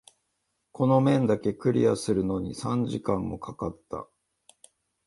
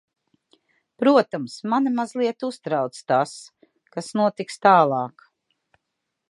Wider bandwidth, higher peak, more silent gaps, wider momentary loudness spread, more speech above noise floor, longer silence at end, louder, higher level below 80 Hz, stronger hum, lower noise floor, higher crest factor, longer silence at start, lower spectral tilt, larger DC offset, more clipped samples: about the same, 11.5 kHz vs 11.5 kHz; second, -8 dBFS vs -2 dBFS; neither; about the same, 13 LU vs 13 LU; second, 52 dB vs 59 dB; second, 1.05 s vs 1.2 s; second, -26 LUFS vs -22 LUFS; first, -54 dBFS vs -78 dBFS; neither; about the same, -78 dBFS vs -80 dBFS; about the same, 18 dB vs 22 dB; second, 0.8 s vs 1 s; first, -7.5 dB/octave vs -5.5 dB/octave; neither; neither